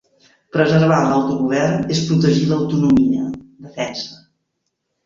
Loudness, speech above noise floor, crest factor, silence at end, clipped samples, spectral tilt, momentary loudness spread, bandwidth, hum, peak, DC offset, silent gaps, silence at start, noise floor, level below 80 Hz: -17 LUFS; 57 dB; 16 dB; 0.9 s; under 0.1%; -6.5 dB/octave; 13 LU; 7.6 kHz; none; -2 dBFS; under 0.1%; none; 0.55 s; -74 dBFS; -50 dBFS